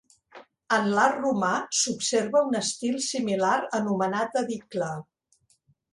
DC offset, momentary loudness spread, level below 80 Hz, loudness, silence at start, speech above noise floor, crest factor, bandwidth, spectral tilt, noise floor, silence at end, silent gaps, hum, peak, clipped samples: under 0.1%; 8 LU; -70 dBFS; -26 LUFS; 0.35 s; 42 dB; 20 dB; 11.5 kHz; -3.5 dB/octave; -67 dBFS; 0.9 s; none; none; -8 dBFS; under 0.1%